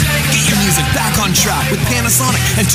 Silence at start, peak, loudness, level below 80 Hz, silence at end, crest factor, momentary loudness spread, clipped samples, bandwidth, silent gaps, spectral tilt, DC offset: 0 s; 0 dBFS; -12 LUFS; -28 dBFS; 0 s; 12 dB; 3 LU; under 0.1%; 16 kHz; none; -3 dB/octave; under 0.1%